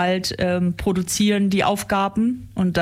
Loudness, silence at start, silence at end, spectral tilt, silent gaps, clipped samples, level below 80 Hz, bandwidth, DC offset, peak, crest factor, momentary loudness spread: -21 LUFS; 0 s; 0 s; -5 dB/octave; none; under 0.1%; -44 dBFS; 16 kHz; under 0.1%; -8 dBFS; 12 dB; 4 LU